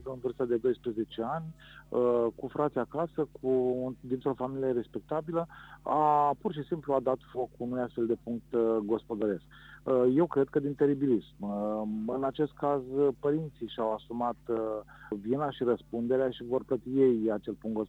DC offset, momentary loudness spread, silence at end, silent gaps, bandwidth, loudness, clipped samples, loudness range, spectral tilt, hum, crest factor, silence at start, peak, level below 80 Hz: under 0.1%; 9 LU; 0 s; none; 7.6 kHz; -31 LUFS; under 0.1%; 3 LU; -9 dB/octave; none; 16 dB; 0 s; -14 dBFS; -62 dBFS